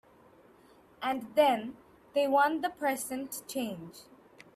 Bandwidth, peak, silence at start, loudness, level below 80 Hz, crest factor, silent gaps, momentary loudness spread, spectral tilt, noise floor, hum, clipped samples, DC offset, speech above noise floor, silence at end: 16 kHz; -12 dBFS; 1 s; -31 LUFS; -74 dBFS; 20 dB; none; 12 LU; -3.5 dB/octave; -60 dBFS; none; under 0.1%; under 0.1%; 29 dB; 0.55 s